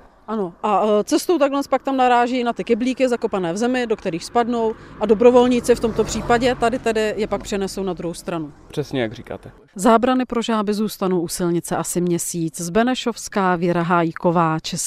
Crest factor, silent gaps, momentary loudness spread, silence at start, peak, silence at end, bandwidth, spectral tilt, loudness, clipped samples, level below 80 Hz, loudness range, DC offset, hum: 18 dB; none; 10 LU; 0.3 s; 0 dBFS; 0 s; 15.5 kHz; -5 dB/octave; -20 LUFS; under 0.1%; -46 dBFS; 4 LU; under 0.1%; none